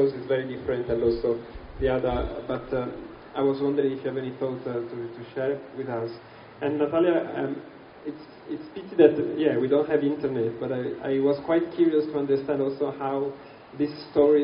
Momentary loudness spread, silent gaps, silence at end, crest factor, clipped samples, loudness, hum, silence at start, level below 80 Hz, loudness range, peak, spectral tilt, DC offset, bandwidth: 15 LU; none; 0 s; 24 dB; under 0.1%; -26 LUFS; none; 0 s; -48 dBFS; 5 LU; -2 dBFS; -6 dB/octave; under 0.1%; 5.4 kHz